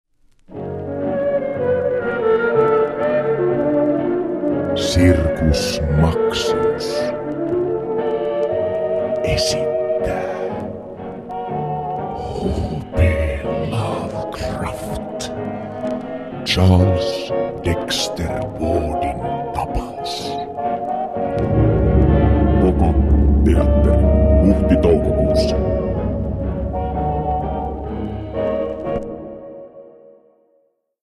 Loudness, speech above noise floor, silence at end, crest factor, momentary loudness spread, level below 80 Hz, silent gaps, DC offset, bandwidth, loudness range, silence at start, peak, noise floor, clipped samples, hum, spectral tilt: -19 LUFS; 47 dB; 1.1 s; 16 dB; 11 LU; -24 dBFS; none; under 0.1%; 13 kHz; 8 LU; 0.5 s; -2 dBFS; -62 dBFS; under 0.1%; none; -6.5 dB/octave